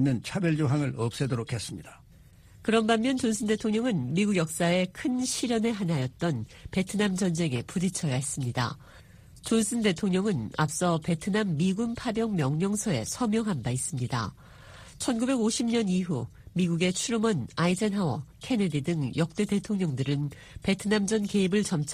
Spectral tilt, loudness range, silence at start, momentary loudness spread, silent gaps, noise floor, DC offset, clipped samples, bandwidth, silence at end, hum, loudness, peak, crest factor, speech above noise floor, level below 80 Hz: -5.5 dB/octave; 2 LU; 0 s; 6 LU; none; -54 dBFS; under 0.1%; under 0.1%; 15.5 kHz; 0 s; none; -28 LUFS; -8 dBFS; 20 dB; 26 dB; -56 dBFS